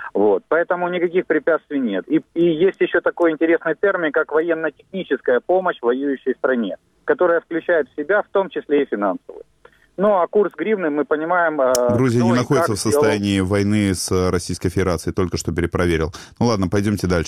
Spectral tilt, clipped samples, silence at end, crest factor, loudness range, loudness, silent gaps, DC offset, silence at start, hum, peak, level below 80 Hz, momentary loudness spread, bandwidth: -6 dB/octave; under 0.1%; 0 s; 18 dB; 3 LU; -19 LUFS; none; under 0.1%; 0 s; none; -2 dBFS; -44 dBFS; 6 LU; 19.5 kHz